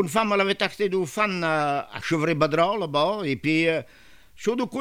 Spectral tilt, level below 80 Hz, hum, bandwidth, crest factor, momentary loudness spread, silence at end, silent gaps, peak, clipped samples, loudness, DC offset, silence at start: -5 dB/octave; -58 dBFS; none; 16 kHz; 18 dB; 6 LU; 0 s; none; -6 dBFS; under 0.1%; -24 LUFS; 0.2%; 0 s